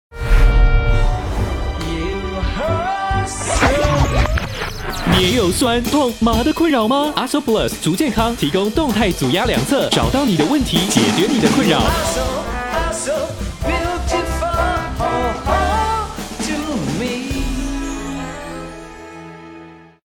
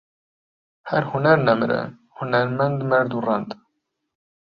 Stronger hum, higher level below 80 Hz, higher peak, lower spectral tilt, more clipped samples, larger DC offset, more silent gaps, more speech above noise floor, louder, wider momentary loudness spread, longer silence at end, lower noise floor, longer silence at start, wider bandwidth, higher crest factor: neither; first, -24 dBFS vs -62 dBFS; about the same, 0 dBFS vs -2 dBFS; second, -4.5 dB/octave vs -9 dB/octave; neither; neither; neither; second, 23 dB vs 54 dB; first, -18 LUFS vs -21 LUFS; second, 10 LU vs 17 LU; second, 0.25 s vs 1 s; second, -39 dBFS vs -75 dBFS; second, 0.1 s vs 0.85 s; first, 18 kHz vs 5.8 kHz; about the same, 16 dB vs 20 dB